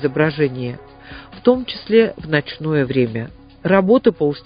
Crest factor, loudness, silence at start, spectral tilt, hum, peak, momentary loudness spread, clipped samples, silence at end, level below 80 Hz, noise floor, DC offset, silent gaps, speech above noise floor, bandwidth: 18 dB; -18 LUFS; 0 s; -12 dB/octave; none; 0 dBFS; 19 LU; under 0.1%; 0.05 s; -48 dBFS; -38 dBFS; under 0.1%; none; 21 dB; 5.2 kHz